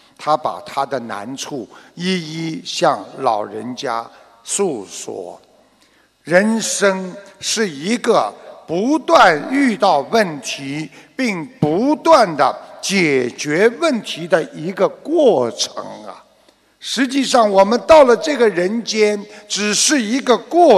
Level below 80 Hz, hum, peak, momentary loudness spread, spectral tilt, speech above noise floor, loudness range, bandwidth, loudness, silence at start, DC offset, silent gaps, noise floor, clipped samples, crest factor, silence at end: -56 dBFS; none; 0 dBFS; 15 LU; -3.5 dB/octave; 39 dB; 8 LU; 13 kHz; -16 LUFS; 0.2 s; under 0.1%; none; -55 dBFS; under 0.1%; 16 dB; 0 s